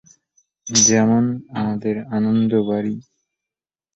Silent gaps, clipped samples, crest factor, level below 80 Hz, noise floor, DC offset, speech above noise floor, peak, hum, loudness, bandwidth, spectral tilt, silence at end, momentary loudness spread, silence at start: none; under 0.1%; 18 dB; -56 dBFS; -89 dBFS; under 0.1%; 71 dB; -2 dBFS; none; -18 LUFS; 8.2 kHz; -4 dB/octave; 0.95 s; 12 LU; 0.65 s